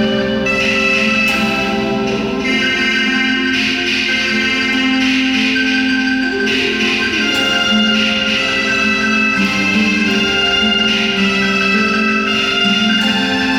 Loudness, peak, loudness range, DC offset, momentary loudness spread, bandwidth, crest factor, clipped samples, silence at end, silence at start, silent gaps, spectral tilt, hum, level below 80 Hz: -13 LUFS; -4 dBFS; 1 LU; under 0.1%; 3 LU; 16.5 kHz; 10 dB; under 0.1%; 0 s; 0 s; none; -3.5 dB/octave; none; -42 dBFS